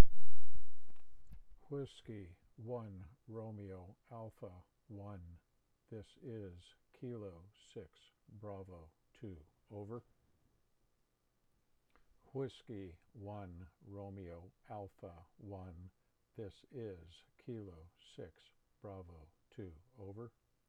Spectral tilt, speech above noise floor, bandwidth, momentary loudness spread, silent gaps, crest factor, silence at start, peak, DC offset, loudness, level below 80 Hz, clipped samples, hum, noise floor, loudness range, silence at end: -8 dB/octave; 32 dB; 8.4 kHz; 16 LU; none; 24 dB; 0 s; -10 dBFS; under 0.1%; -51 LUFS; -62 dBFS; under 0.1%; none; -80 dBFS; 5 LU; 3.15 s